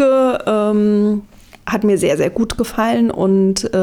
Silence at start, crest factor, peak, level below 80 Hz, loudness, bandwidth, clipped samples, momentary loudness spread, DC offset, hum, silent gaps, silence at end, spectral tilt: 0 s; 10 dB; -4 dBFS; -40 dBFS; -16 LUFS; 17 kHz; under 0.1%; 5 LU; under 0.1%; none; none; 0 s; -6 dB/octave